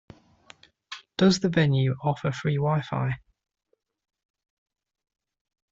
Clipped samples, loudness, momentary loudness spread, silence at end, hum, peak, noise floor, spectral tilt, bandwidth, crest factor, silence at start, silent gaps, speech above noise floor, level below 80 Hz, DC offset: under 0.1%; -25 LUFS; 15 LU; 2.55 s; none; -8 dBFS; -75 dBFS; -6.5 dB/octave; 7.8 kHz; 20 dB; 0.9 s; none; 51 dB; -60 dBFS; under 0.1%